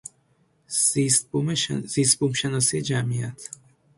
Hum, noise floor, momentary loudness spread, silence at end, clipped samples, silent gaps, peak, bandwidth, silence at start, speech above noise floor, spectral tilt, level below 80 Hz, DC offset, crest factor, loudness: none; -64 dBFS; 14 LU; 0.5 s; under 0.1%; none; -4 dBFS; 11.5 kHz; 0.7 s; 41 dB; -3.5 dB/octave; -60 dBFS; under 0.1%; 22 dB; -22 LUFS